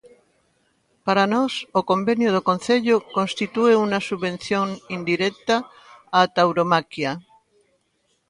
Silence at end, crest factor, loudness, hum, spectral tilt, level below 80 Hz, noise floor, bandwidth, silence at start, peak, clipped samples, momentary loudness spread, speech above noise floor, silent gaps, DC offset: 1.1 s; 20 dB; -21 LUFS; none; -5.5 dB/octave; -64 dBFS; -68 dBFS; 11 kHz; 1.05 s; -2 dBFS; under 0.1%; 9 LU; 48 dB; none; under 0.1%